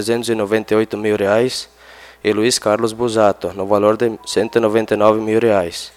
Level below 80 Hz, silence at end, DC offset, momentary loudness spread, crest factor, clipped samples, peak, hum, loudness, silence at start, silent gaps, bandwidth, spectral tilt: -54 dBFS; 0.05 s; under 0.1%; 6 LU; 16 dB; under 0.1%; 0 dBFS; none; -16 LUFS; 0 s; none; 16 kHz; -4.5 dB/octave